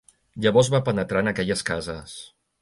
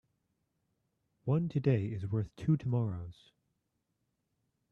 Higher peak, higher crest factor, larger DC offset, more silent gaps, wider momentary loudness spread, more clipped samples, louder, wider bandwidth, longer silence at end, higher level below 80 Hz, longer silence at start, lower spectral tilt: first, -4 dBFS vs -16 dBFS; about the same, 20 dB vs 20 dB; neither; neither; first, 20 LU vs 11 LU; neither; first, -23 LUFS vs -34 LUFS; first, 11.5 kHz vs 6.8 kHz; second, 0.35 s vs 1.6 s; first, -50 dBFS vs -64 dBFS; second, 0.35 s vs 1.25 s; second, -5 dB/octave vs -10 dB/octave